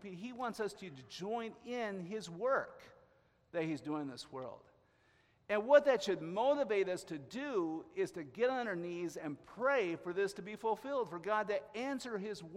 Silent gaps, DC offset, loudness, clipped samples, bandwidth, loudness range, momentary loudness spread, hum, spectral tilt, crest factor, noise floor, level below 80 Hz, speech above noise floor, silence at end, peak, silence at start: none; under 0.1%; -37 LUFS; under 0.1%; 13.5 kHz; 7 LU; 12 LU; none; -5 dB/octave; 24 dB; -71 dBFS; -78 dBFS; 34 dB; 0 s; -14 dBFS; 0 s